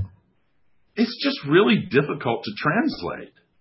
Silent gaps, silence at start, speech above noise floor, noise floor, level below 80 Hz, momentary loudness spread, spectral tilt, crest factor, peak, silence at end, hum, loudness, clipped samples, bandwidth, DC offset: none; 0 s; 46 dB; -68 dBFS; -54 dBFS; 16 LU; -10 dB/octave; 20 dB; -4 dBFS; 0.35 s; none; -22 LUFS; under 0.1%; 5.8 kHz; under 0.1%